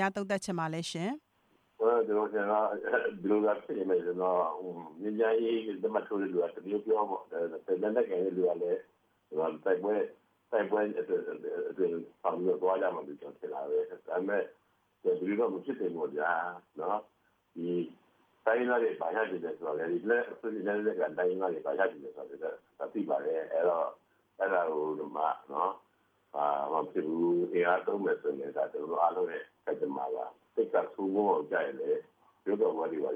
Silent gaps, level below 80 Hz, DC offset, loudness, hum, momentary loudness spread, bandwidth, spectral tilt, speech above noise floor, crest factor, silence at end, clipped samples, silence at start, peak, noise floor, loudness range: none; -84 dBFS; under 0.1%; -33 LUFS; none; 9 LU; 10.5 kHz; -6 dB/octave; 40 dB; 18 dB; 0 s; under 0.1%; 0 s; -14 dBFS; -71 dBFS; 3 LU